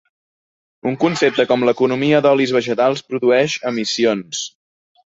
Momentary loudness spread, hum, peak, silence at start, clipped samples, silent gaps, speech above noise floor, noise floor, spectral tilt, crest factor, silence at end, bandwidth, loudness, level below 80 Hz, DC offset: 10 LU; none; -2 dBFS; 0.85 s; under 0.1%; none; over 74 dB; under -90 dBFS; -4.5 dB/octave; 16 dB; 0.6 s; 8 kHz; -17 LUFS; -62 dBFS; under 0.1%